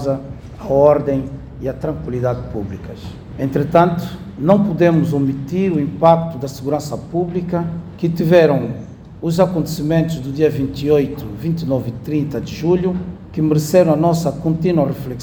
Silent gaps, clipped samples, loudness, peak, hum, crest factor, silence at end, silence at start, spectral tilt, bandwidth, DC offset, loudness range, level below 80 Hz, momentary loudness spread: none; under 0.1%; -17 LUFS; 0 dBFS; none; 16 dB; 0 s; 0 s; -7.5 dB/octave; over 20 kHz; under 0.1%; 3 LU; -42 dBFS; 13 LU